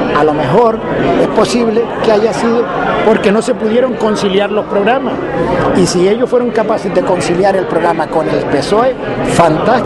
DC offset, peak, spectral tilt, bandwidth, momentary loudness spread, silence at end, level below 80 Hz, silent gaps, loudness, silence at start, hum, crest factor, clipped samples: under 0.1%; 0 dBFS; -5.5 dB/octave; 12 kHz; 4 LU; 0 s; -38 dBFS; none; -12 LUFS; 0 s; none; 12 dB; under 0.1%